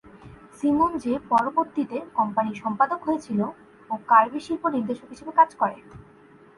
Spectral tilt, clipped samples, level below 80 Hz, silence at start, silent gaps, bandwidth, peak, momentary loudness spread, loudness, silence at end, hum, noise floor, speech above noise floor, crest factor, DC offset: -7 dB/octave; under 0.1%; -60 dBFS; 0.25 s; none; 11.5 kHz; -4 dBFS; 12 LU; -24 LUFS; 0.55 s; none; -52 dBFS; 28 dB; 20 dB; under 0.1%